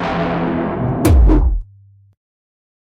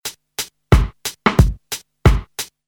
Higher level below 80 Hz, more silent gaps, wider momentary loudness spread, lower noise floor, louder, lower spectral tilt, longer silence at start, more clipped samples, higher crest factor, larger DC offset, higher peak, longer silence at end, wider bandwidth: about the same, -18 dBFS vs -22 dBFS; neither; second, 8 LU vs 13 LU; first, -46 dBFS vs -33 dBFS; first, -16 LUFS vs -19 LUFS; first, -7.5 dB/octave vs -5 dB/octave; about the same, 0 s vs 0.05 s; neither; about the same, 14 dB vs 18 dB; neither; about the same, -2 dBFS vs 0 dBFS; first, 1.3 s vs 0.2 s; second, 16 kHz vs 19 kHz